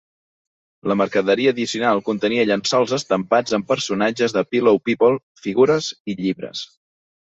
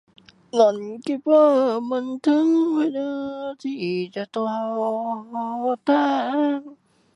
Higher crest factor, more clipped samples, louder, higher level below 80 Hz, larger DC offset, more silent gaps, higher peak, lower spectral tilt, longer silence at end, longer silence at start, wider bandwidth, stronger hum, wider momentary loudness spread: about the same, 16 dB vs 18 dB; neither; first, -19 LUFS vs -22 LUFS; first, -62 dBFS vs -74 dBFS; neither; first, 5.23-5.35 s, 6.00-6.05 s vs none; about the same, -4 dBFS vs -4 dBFS; second, -4.5 dB/octave vs -6 dB/octave; first, 0.7 s vs 0.4 s; first, 0.85 s vs 0.55 s; second, 8 kHz vs 10 kHz; neither; second, 8 LU vs 11 LU